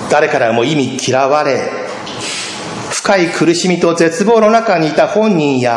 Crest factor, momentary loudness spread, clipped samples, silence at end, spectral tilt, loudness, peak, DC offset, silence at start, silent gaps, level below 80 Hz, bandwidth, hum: 12 dB; 10 LU; under 0.1%; 0 s; -4.5 dB/octave; -13 LUFS; 0 dBFS; under 0.1%; 0 s; none; -56 dBFS; 11.5 kHz; none